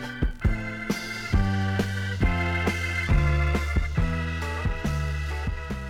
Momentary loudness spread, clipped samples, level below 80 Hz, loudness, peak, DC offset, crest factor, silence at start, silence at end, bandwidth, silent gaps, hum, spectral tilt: 6 LU; under 0.1%; -30 dBFS; -27 LUFS; -10 dBFS; under 0.1%; 14 dB; 0 s; 0 s; 15 kHz; none; none; -6 dB/octave